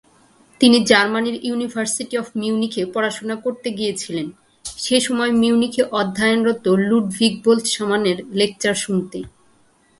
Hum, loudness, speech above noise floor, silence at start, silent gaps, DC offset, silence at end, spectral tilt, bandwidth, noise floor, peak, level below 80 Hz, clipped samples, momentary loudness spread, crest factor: none; -19 LUFS; 38 dB; 0.6 s; none; under 0.1%; 0.7 s; -4 dB/octave; 11.5 kHz; -56 dBFS; 0 dBFS; -56 dBFS; under 0.1%; 11 LU; 20 dB